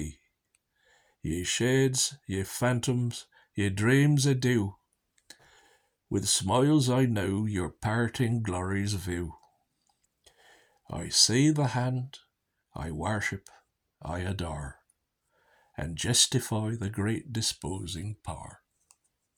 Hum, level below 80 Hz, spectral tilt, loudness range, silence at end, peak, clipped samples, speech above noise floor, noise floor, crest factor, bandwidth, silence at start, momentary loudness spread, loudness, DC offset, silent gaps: none; -54 dBFS; -4 dB/octave; 7 LU; 0.8 s; -8 dBFS; under 0.1%; 48 dB; -76 dBFS; 22 dB; 20 kHz; 0 s; 18 LU; -28 LUFS; under 0.1%; none